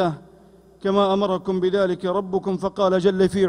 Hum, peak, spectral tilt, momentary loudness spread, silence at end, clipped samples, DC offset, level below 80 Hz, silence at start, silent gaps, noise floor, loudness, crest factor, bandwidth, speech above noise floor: none; -6 dBFS; -7 dB/octave; 6 LU; 0 s; under 0.1%; under 0.1%; -54 dBFS; 0 s; none; -50 dBFS; -21 LUFS; 14 dB; 10.5 kHz; 30 dB